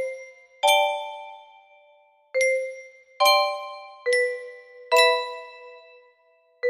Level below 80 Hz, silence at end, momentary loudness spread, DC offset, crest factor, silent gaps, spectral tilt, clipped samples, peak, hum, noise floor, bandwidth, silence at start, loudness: -78 dBFS; 0 s; 22 LU; under 0.1%; 20 dB; none; 2.5 dB/octave; under 0.1%; -6 dBFS; none; -62 dBFS; 15.5 kHz; 0 s; -22 LUFS